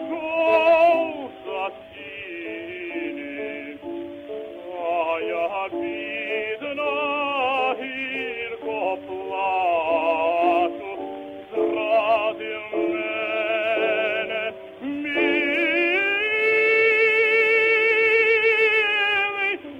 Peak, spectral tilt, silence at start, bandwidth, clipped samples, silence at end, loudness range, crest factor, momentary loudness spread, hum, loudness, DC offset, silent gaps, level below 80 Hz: -8 dBFS; -4.5 dB/octave; 0 s; 8.4 kHz; under 0.1%; 0 s; 11 LU; 16 dB; 16 LU; none; -21 LUFS; under 0.1%; none; -66 dBFS